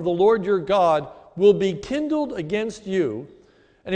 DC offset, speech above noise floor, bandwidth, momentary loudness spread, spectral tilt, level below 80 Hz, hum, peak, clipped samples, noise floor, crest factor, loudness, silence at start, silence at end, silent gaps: under 0.1%; 34 dB; 9.2 kHz; 9 LU; -6.5 dB/octave; -54 dBFS; none; -6 dBFS; under 0.1%; -54 dBFS; 16 dB; -21 LUFS; 0 s; 0 s; none